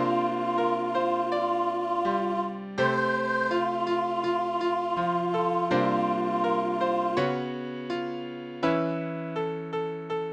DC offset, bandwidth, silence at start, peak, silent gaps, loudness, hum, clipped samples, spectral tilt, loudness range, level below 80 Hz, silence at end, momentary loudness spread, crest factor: under 0.1%; 9.4 kHz; 0 s; -12 dBFS; none; -27 LUFS; none; under 0.1%; -7 dB/octave; 3 LU; -68 dBFS; 0 s; 7 LU; 14 dB